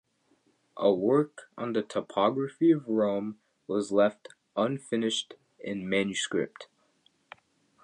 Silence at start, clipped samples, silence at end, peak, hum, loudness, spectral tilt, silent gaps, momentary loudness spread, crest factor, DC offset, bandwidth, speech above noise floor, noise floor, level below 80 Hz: 0.75 s; under 0.1%; 1.2 s; -10 dBFS; none; -29 LUFS; -5 dB/octave; none; 13 LU; 20 dB; under 0.1%; 10.5 kHz; 41 dB; -69 dBFS; -72 dBFS